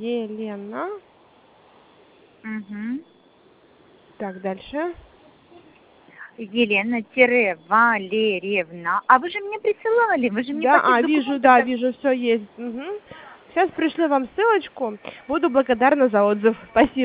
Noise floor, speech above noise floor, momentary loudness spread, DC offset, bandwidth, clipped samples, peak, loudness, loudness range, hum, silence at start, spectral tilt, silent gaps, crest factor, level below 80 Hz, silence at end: -55 dBFS; 34 dB; 16 LU; under 0.1%; 4 kHz; under 0.1%; 0 dBFS; -20 LUFS; 15 LU; none; 0 s; -8.5 dB/octave; none; 22 dB; -58 dBFS; 0 s